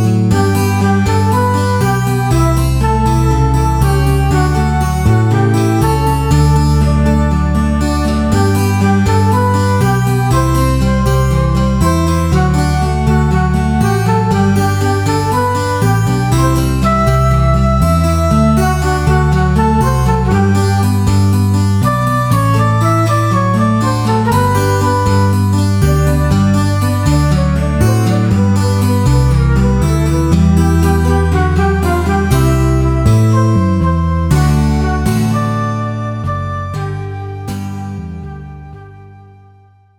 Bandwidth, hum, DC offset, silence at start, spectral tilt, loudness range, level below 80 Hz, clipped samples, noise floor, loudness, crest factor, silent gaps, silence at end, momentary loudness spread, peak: 19.5 kHz; none; under 0.1%; 0 s; -7 dB/octave; 2 LU; -20 dBFS; under 0.1%; -45 dBFS; -12 LUFS; 12 dB; none; 0.8 s; 3 LU; 0 dBFS